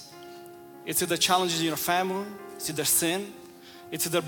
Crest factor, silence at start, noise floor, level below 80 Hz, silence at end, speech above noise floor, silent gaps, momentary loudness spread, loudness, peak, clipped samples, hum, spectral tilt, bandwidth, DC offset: 22 dB; 0 s; -47 dBFS; -66 dBFS; 0 s; 20 dB; none; 23 LU; -26 LUFS; -6 dBFS; under 0.1%; none; -2.5 dB/octave; 18 kHz; under 0.1%